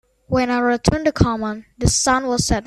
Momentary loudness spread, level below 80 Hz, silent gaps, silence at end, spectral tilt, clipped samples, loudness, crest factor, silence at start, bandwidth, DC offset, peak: 6 LU; -32 dBFS; none; 0.05 s; -4.5 dB/octave; under 0.1%; -19 LUFS; 18 dB; 0.3 s; 13.5 kHz; under 0.1%; 0 dBFS